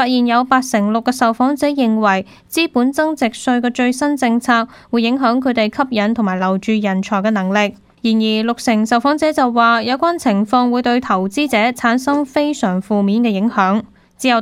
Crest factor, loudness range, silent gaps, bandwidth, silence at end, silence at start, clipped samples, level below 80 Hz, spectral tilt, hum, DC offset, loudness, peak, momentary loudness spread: 16 dB; 2 LU; none; 15.5 kHz; 0 s; 0 s; under 0.1%; -54 dBFS; -5 dB/octave; none; under 0.1%; -16 LUFS; 0 dBFS; 4 LU